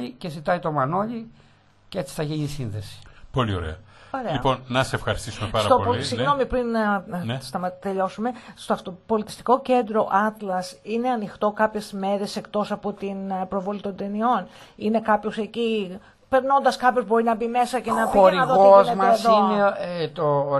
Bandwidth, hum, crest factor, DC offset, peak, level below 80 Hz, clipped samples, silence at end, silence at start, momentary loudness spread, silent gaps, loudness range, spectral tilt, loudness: 12.5 kHz; none; 20 dB; under 0.1%; -2 dBFS; -48 dBFS; under 0.1%; 0 s; 0 s; 13 LU; none; 10 LU; -6 dB/octave; -23 LUFS